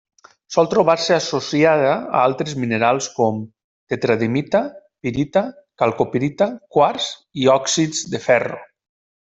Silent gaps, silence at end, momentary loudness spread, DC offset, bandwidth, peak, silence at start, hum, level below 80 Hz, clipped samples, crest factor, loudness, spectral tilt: 3.64-3.87 s; 0.75 s; 10 LU; under 0.1%; 8.2 kHz; -2 dBFS; 0.5 s; none; -56 dBFS; under 0.1%; 18 dB; -19 LUFS; -4.5 dB/octave